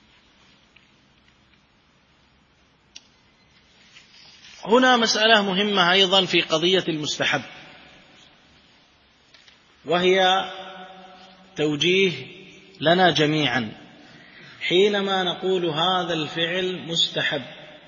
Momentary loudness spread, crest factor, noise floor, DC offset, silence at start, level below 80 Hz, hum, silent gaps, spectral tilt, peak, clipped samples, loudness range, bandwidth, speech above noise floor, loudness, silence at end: 20 LU; 22 dB; -60 dBFS; under 0.1%; 4.45 s; -66 dBFS; none; none; -3.5 dB/octave; -2 dBFS; under 0.1%; 7 LU; 7.4 kHz; 39 dB; -20 LUFS; 0.1 s